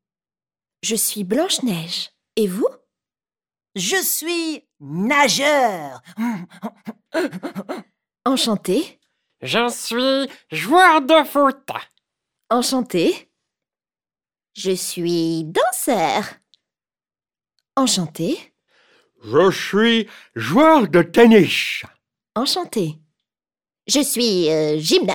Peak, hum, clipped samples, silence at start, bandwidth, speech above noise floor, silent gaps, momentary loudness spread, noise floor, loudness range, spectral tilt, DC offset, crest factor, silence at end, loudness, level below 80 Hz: 0 dBFS; none; under 0.1%; 0.85 s; over 20 kHz; over 72 dB; none; 18 LU; under -90 dBFS; 8 LU; -3.5 dB/octave; under 0.1%; 18 dB; 0 s; -18 LUFS; -62 dBFS